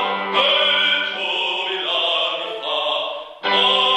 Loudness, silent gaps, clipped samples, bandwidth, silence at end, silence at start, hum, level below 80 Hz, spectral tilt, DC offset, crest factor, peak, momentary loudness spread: -18 LUFS; none; under 0.1%; 12 kHz; 0 s; 0 s; none; -72 dBFS; -2 dB/octave; under 0.1%; 16 dB; -4 dBFS; 9 LU